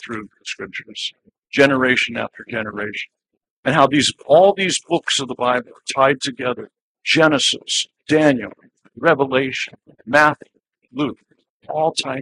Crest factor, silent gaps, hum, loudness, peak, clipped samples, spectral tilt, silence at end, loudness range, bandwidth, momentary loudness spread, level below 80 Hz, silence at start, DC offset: 20 dB; 3.51-3.63 s, 6.81-6.95 s, 11.50-11.60 s; none; -18 LUFS; 0 dBFS; under 0.1%; -3.5 dB/octave; 0 s; 3 LU; 11.5 kHz; 15 LU; -62 dBFS; 0 s; under 0.1%